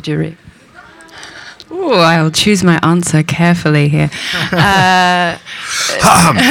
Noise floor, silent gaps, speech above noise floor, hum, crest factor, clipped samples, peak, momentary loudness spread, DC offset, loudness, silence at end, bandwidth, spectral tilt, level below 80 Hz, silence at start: -39 dBFS; none; 28 dB; none; 12 dB; under 0.1%; 0 dBFS; 15 LU; under 0.1%; -11 LUFS; 0 s; 19 kHz; -4.5 dB/octave; -40 dBFS; 0.05 s